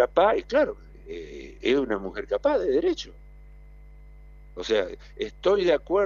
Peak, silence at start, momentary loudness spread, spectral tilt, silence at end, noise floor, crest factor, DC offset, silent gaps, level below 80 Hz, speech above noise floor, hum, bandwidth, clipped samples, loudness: -8 dBFS; 0 s; 18 LU; -5 dB/octave; 0 s; -47 dBFS; 18 dB; under 0.1%; none; -46 dBFS; 22 dB; 50 Hz at -45 dBFS; 7.4 kHz; under 0.1%; -25 LUFS